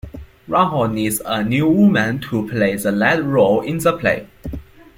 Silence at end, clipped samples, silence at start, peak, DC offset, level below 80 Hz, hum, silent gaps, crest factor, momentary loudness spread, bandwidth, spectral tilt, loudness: 0.35 s; under 0.1%; 0.05 s; -2 dBFS; under 0.1%; -42 dBFS; none; none; 16 dB; 15 LU; 16.5 kHz; -6 dB/octave; -17 LUFS